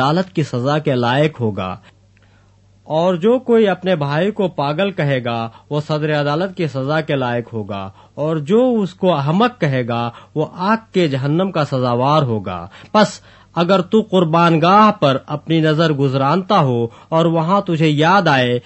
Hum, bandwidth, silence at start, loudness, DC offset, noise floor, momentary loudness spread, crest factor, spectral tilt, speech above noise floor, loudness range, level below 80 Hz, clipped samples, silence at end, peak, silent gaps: none; 8.4 kHz; 0 s; -16 LUFS; under 0.1%; -51 dBFS; 11 LU; 16 dB; -7 dB/octave; 35 dB; 5 LU; -56 dBFS; under 0.1%; 0.05 s; 0 dBFS; none